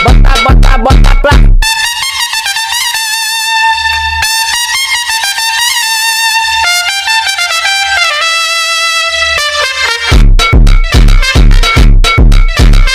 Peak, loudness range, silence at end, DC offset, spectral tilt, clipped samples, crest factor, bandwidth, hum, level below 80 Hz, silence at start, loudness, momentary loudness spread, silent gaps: 0 dBFS; 1 LU; 0 s; under 0.1%; -3 dB/octave; 6%; 6 dB; 16 kHz; none; -8 dBFS; 0 s; -8 LUFS; 3 LU; none